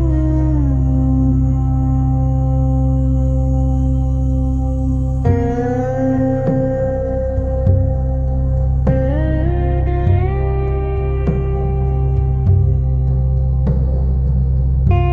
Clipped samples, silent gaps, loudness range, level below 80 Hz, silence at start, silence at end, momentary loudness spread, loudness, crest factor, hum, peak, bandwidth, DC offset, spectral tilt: under 0.1%; none; 1 LU; -18 dBFS; 0 s; 0 s; 3 LU; -17 LUFS; 12 dB; none; -2 dBFS; 3.3 kHz; under 0.1%; -11 dB/octave